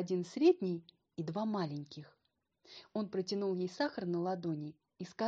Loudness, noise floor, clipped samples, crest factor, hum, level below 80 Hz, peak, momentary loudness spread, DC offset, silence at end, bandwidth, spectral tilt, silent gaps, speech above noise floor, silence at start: -36 LUFS; -73 dBFS; under 0.1%; 20 dB; none; -82 dBFS; -18 dBFS; 20 LU; under 0.1%; 0 s; 7.8 kHz; -7 dB/octave; none; 37 dB; 0 s